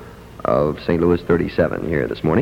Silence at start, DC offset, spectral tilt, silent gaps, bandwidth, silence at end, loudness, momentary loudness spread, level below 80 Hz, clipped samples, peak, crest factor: 0 s; under 0.1%; -8.5 dB/octave; none; 16 kHz; 0 s; -19 LUFS; 4 LU; -40 dBFS; under 0.1%; -4 dBFS; 16 dB